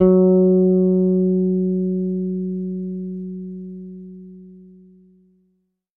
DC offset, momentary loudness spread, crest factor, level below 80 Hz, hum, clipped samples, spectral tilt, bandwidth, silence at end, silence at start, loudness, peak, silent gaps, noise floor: under 0.1%; 21 LU; 16 dB; -52 dBFS; none; under 0.1%; -14.5 dB/octave; 1.6 kHz; 1.35 s; 0 s; -19 LUFS; -2 dBFS; none; -68 dBFS